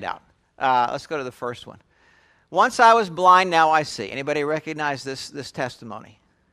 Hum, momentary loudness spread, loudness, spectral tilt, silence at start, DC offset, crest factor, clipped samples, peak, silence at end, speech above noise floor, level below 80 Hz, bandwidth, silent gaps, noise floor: none; 18 LU; -20 LUFS; -4 dB/octave; 0 s; under 0.1%; 20 dB; under 0.1%; -2 dBFS; 0.5 s; 37 dB; -64 dBFS; 14 kHz; none; -58 dBFS